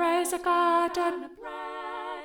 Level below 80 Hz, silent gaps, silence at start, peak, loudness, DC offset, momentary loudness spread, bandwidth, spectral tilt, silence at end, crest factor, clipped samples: -64 dBFS; none; 0 s; -14 dBFS; -27 LUFS; under 0.1%; 14 LU; 19.5 kHz; -1.5 dB/octave; 0 s; 14 dB; under 0.1%